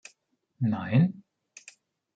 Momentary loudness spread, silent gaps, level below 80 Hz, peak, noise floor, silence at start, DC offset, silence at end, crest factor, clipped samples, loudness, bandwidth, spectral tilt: 25 LU; none; -68 dBFS; -12 dBFS; -71 dBFS; 0.6 s; under 0.1%; 0.95 s; 18 dB; under 0.1%; -27 LUFS; 9 kHz; -8 dB/octave